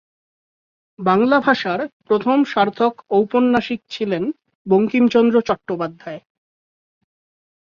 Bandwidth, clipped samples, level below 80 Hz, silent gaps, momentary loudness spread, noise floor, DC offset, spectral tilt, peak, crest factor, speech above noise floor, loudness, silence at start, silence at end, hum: 7 kHz; under 0.1%; -62 dBFS; 1.93-2.00 s, 4.55-4.65 s; 12 LU; under -90 dBFS; under 0.1%; -7 dB/octave; -2 dBFS; 16 dB; over 73 dB; -18 LUFS; 1 s; 1.55 s; none